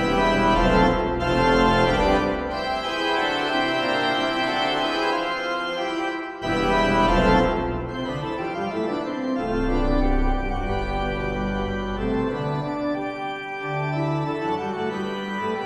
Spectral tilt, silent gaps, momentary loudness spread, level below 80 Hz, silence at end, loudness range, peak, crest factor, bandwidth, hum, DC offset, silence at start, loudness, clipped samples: -6 dB/octave; none; 9 LU; -32 dBFS; 0 s; 5 LU; -6 dBFS; 16 dB; 12.5 kHz; none; under 0.1%; 0 s; -23 LUFS; under 0.1%